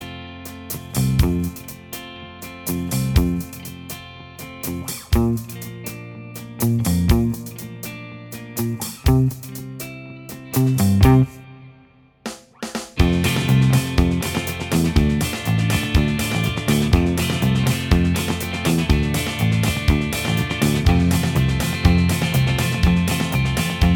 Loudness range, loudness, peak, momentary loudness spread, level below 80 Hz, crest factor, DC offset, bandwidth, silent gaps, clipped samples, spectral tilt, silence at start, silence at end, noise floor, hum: 6 LU; -20 LUFS; 0 dBFS; 17 LU; -28 dBFS; 18 dB; under 0.1%; over 20 kHz; none; under 0.1%; -5.5 dB/octave; 0 s; 0 s; -51 dBFS; none